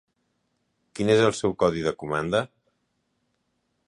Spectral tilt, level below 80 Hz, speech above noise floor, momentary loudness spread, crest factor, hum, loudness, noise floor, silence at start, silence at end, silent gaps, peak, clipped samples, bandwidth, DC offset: -5.5 dB/octave; -56 dBFS; 51 dB; 11 LU; 20 dB; none; -24 LUFS; -74 dBFS; 0.95 s; 1.4 s; none; -6 dBFS; under 0.1%; 11 kHz; under 0.1%